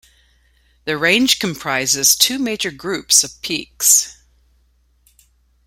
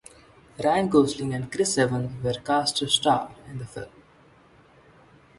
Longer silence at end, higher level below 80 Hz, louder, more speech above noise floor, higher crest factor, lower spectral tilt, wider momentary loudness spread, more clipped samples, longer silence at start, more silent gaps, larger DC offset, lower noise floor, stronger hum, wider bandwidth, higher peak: about the same, 1.55 s vs 1.5 s; about the same, -54 dBFS vs -56 dBFS; first, -15 LUFS vs -24 LUFS; first, 41 dB vs 31 dB; about the same, 20 dB vs 20 dB; second, -1 dB/octave vs -4 dB/octave; second, 12 LU vs 17 LU; neither; first, 0.85 s vs 0.6 s; neither; neither; about the same, -58 dBFS vs -55 dBFS; neither; first, 16.5 kHz vs 11.5 kHz; first, 0 dBFS vs -6 dBFS